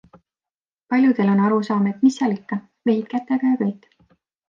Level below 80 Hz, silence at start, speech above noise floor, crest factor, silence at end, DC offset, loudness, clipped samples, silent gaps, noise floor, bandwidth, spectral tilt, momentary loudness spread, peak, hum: -72 dBFS; 0.9 s; over 71 dB; 14 dB; 0.75 s; under 0.1%; -20 LUFS; under 0.1%; none; under -90 dBFS; 7.6 kHz; -7.5 dB/octave; 9 LU; -6 dBFS; none